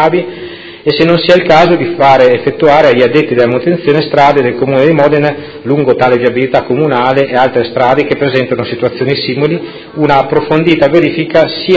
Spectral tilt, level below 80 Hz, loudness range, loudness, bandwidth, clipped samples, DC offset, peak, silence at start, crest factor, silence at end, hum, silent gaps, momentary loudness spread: -7 dB/octave; -44 dBFS; 4 LU; -9 LUFS; 8 kHz; 0.9%; under 0.1%; 0 dBFS; 0 s; 8 dB; 0 s; none; none; 8 LU